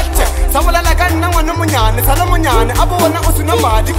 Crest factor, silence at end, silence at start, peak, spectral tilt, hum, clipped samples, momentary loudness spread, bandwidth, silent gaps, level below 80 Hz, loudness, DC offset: 10 dB; 0 s; 0 s; 0 dBFS; -4.5 dB/octave; none; under 0.1%; 2 LU; 16.5 kHz; none; -14 dBFS; -13 LUFS; under 0.1%